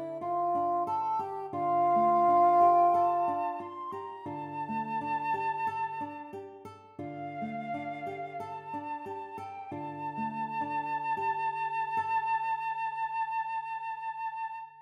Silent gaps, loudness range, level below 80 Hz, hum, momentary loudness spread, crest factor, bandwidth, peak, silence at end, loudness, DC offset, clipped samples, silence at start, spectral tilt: none; 12 LU; -84 dBFS; none; 16 LU; 16 dB; 6.6 kHz; -14 dBFS; 0 s; -31 LUFS; under 0.1%; under 0.1%; 0 s; -7.5 dB/octave